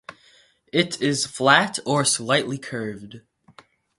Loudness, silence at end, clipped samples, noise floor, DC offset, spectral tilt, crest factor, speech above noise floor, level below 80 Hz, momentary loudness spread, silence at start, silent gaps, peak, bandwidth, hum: -21 LUFS; 0.8 s; under 0.1%; -57 dBFS; under 0.1%; -3 dB/octave; 24 dB; 35 dB; -64 dBFS; 14 LU; 0.1 s; none; 0 dBFS; 11.5 kHz; none